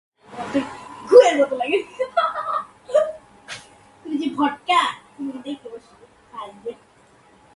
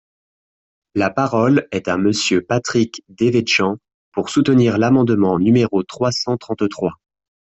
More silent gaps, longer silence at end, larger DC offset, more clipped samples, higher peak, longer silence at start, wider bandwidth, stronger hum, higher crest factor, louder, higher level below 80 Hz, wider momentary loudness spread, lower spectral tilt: second, none vs 3.94-4.12 s; first, 0.8 s vs 0.6 s; neither; neither; first, 0 dBFS vs -4 dBFS; second, 0.3 s vs 0.95 s; first, 11.5 kHz vs 8.2 kHz; neither; first, 22 dB vs 14 dB; second, -20 LUFS vs -17 LUFS; second, -64 dBFS vs -54 dBFS; first, 23 LU vs 9 LU; second, -3.5 dB/octave vs -5.5 dB/octave